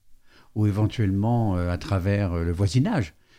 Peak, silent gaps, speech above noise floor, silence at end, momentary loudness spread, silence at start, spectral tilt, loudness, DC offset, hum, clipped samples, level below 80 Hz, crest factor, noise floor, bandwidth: -10 dBFS; none; 28 dB; 0.3 s; 4 LU; 0.1 s; -7.5 dB/octave; -24 LUFS; under 0.1%; none; under 0.1%; -46 dBFS; 14 dB; -51 dBFS; 10.5 kHz